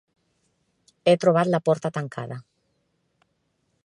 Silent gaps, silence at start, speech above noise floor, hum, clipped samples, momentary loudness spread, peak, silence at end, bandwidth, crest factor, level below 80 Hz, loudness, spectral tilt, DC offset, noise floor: none; 1.05 s; 50 dB; none; under 0.1%; 17 LU; -6 dBFS; 1.45 s; 11 kHz; 20 dB; -72 dBFS; -23 LUFS; -6.5 dB/octave; under 0.1%; -72 dBFS